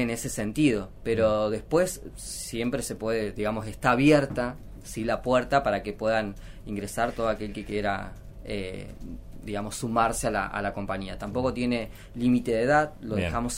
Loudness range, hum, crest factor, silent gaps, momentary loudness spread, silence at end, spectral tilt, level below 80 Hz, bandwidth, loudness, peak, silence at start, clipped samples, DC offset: 5 LU; none; 20 dB; none; 14 LU; 0 s; -5 dB/octave; -44 dBFS; 16 kHz; -27 LUFS; -8 dBFS; 0 s; under 0.1%; under 0.1%